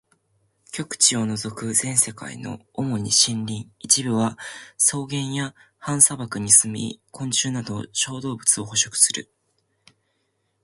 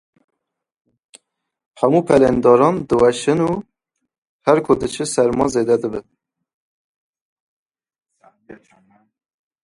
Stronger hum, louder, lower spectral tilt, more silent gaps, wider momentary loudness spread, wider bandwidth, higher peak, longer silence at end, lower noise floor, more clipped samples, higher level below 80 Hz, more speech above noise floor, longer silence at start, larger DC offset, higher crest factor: neither; second, -20 LUFS vs -16 LUFS; second, -2 dB/octave vs -6 dB/octave; second, none vs 4.18-4.22 s, 4.29-4.39 s, 6.54-7.13 s, 7.21-7.70 s; first, 17 LU vs 9 LU; about the same, 12 kHz vs 11.5 kHz; about the same, 0 dBFS vs 0 dBFS; first, 1.4 s vs 1.1 s; second, -72 dBFS vs -79 dBFS; neither; second, -60 dBFS vs -50 dBFS; second, 49 dB vs 64 dB; second, 0.75 s vs 1.8 s; neither; about the same, 24 dB vs 20 dB